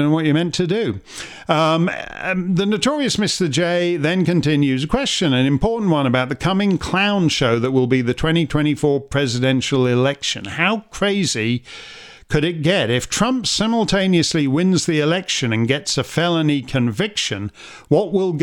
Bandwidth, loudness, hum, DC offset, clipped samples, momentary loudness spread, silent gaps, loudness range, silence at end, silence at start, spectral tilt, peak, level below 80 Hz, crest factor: 16.5 kHz; -18 LUFS; none; under 0.1%; under 0.1%; 6 LU; none; 2 LU; 0 s; 0 s; -5 dB/octave; -2 dBFS; -42 dBFS; 16 dB